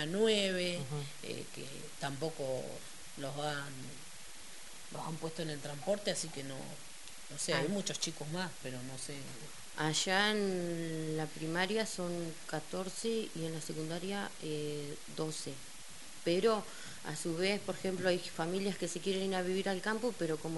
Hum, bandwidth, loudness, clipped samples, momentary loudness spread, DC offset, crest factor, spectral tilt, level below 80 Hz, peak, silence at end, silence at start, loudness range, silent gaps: none; 11.5 kHz; -37 LUFS; under 0.1%; 16 LU; 0.4%; 22 dB; -4 dB/octave; -68 dBFS; -16 dBFS; 0 s; 0 s; 7 LU; none